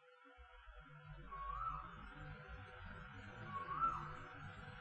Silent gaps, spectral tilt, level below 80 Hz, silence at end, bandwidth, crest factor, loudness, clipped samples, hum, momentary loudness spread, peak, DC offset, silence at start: none; -6.5 dB/octave; -60 dBFS; 0 s; 8.4 kHz; 20 dB; -48 LUFS; under 0.1%; none; 20 LU; -28 dBFS; under 0.1%; 0 s